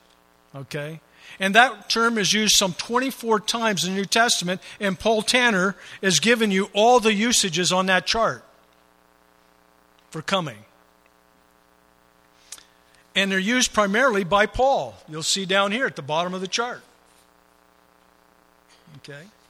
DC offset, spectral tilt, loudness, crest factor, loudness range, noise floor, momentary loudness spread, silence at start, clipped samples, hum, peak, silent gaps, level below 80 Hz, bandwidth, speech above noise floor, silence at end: under 0.1%; -2.5 dB/octave; -20 LUFS; 24 dB; 14 LU; -58 dBFS; 18 LU; 0.55 s; under 0.1%; 60 Hz at -55 dBFS; 0 dBFS; none; -52 dBFS; 15.5 kHz; 37 dB; 0.25 s